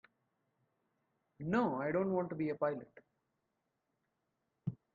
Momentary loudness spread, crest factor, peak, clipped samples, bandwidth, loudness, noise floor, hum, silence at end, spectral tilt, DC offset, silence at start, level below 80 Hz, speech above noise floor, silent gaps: 12 LU; 20 dB; -20 dBFS; under 0.1%; 7.4 kHz; -37 LUFS; -85 dBFS; none; 0.2 s; -9 dB/octave; under 0.1%; 1.4 s; -76 dBFS; 49 dB; none